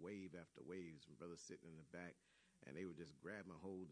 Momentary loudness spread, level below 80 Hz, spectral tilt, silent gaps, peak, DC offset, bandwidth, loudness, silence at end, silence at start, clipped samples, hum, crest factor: 5 LU; -84 dBFS; -5.5 dB/octave; none; -38 dBFS; under 0.1%; 10 kHz; -57 LUFS; 0 s; 0 s; under 0.1%; none; 18 dB